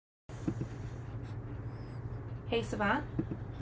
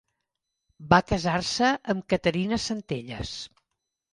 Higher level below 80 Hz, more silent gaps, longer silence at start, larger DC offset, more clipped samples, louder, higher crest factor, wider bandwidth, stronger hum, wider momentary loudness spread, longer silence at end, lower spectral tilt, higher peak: about the same, -50 dBFS vs -48 dBFS; neither; second, 0.3 s vs 0.8 s; neither; neither; second, -38 LUFS vs -26 LUFS; about the same, 18 dB vs 22 dB; second, 8 kHz vs 11 kHz; neither; about the same, 11 LU vs 13 LU; second, 0 s vs 0.65 s; first, -6.5 dB/octave vs -5 dB/octave; second, -18 dBFS vs -6 dBFS